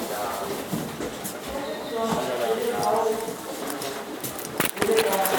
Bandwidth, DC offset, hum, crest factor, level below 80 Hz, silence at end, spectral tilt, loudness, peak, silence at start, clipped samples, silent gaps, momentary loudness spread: over 20 kHz; under 0.1%; none; 24 dB; -56 dBFS; 0 s; -3.5 dB/octave; -27 LUFS; -4 dBFS; 0 s; under 0.1%; none; 10 LU